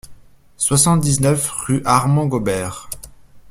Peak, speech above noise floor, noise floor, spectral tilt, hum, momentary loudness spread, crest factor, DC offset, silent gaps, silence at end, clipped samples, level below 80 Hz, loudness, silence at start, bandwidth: 0 dBFS; 25 dB; -41 dBFS; -5 dB/octave; none; 15 LU; 18 dB; under 0.1%; none; 0.1 s; under 0.1%; -44 dBFS; -17 LUFS; 0.1 s; 16 kHz